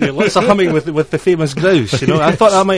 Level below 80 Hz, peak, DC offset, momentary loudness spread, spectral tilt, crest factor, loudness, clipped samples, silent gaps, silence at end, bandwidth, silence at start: -44 dBFS; 0 dBFS; 0.5%; 5 LU; -5.5 dB/octave; 12 dB; -13 LUFS; under 0.1%; none; 0 s; 11 kHz; 0 s